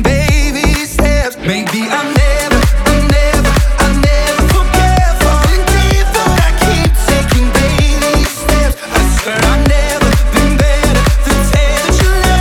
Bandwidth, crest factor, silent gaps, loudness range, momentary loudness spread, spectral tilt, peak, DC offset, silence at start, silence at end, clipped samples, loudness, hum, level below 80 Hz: 18 kHz; 10 dB; none; 1 LU; 2 LU; -4.5 dB/octave; 0 dBFS; under 0.1%; 0 s; 0 s; under 0.1%; -11 LUFS; none; -12 dBFS